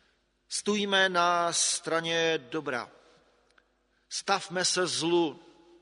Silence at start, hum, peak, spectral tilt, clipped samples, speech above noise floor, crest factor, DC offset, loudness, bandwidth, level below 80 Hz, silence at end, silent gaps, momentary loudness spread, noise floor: 0.5 s; none; -10 dBFS; -2 dB/octave; under 0.1%; 43 dB; 20 dB; under 0.1%; -28 LUFS; 11 kHz; -76 dBFS; 0.45 s; none; 11 LU; -71 dBFS